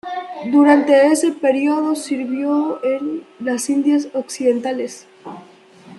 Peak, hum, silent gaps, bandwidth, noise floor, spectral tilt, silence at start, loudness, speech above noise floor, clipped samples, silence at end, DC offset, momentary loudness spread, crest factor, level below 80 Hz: -2 dBFS; none; none; 12 kHz; -43 dBFS; -3.5 dB/octave; 0.05 s; -17 LUFS; 27 dB; under 0.1%; 0 s; under 0.1%; 16 LU; 16 dB; -72 dBFS